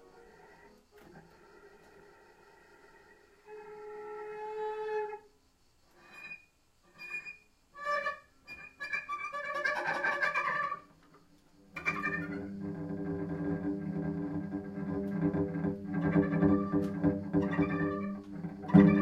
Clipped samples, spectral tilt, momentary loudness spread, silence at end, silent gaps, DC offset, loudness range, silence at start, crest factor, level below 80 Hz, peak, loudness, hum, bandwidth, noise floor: under 0.1%; -8 dB/octave; 18 LU; 0 s; none; under 0.1%; 11 LU; 0.15 s; 26 dB; -60 dBFS; -8 dBFS; -33 LUFS; none; 9.2 kHz; -67 dBFS